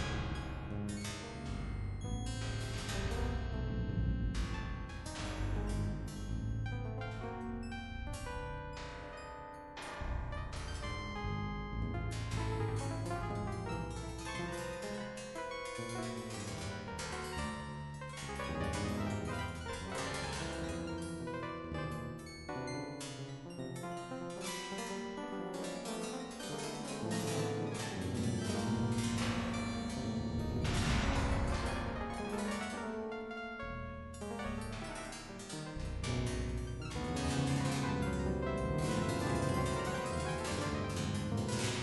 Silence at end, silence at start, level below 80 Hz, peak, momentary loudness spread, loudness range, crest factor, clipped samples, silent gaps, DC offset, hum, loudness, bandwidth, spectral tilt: 0 s; 0 s; -46 dBFS; -20 dBFS; 9 LU; 7 LU; 18 dB; under 0.1%; none; under 0.1%; none; -39 LUFS; 11.5 kHz; -5.5 dB/octave